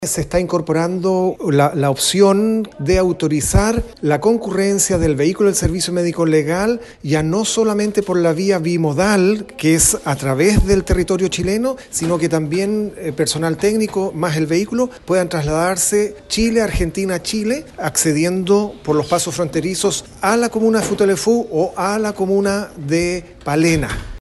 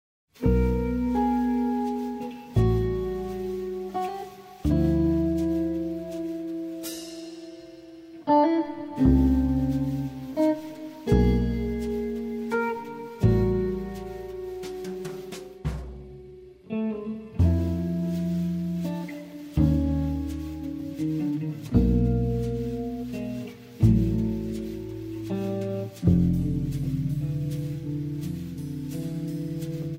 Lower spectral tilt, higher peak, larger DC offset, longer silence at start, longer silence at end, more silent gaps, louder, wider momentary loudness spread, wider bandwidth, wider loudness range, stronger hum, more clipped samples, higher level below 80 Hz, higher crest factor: second, -4.5 dB/octave vs -8.5 dB/octave; first, 0 dBFS vs -8 dBFS; neither; second, 0 s vs 0.4 s; about the same, 0 s vs 0 s; neither; first, -17 LUFS vs -27 LUFS; second, 6 LU vs 14 LU; second, 13 kHz vs 16 kHz; about the same, 3 LU vs 5 LU; neither; neither; about the same, -32 dBFS vs -36 dBFS; about the same, 16 dB vs 18 dB